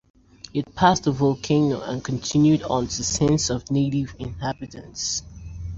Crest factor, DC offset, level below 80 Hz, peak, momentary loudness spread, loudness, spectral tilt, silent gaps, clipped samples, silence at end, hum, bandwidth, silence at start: 20 dB; under 0.1%; -44 dBFS; -2 dBFS; 12 LU; -23 LUFS; -5 dB/octave; none; under 0.1%; 0 s; none; 7.8 kHz; 0.45 s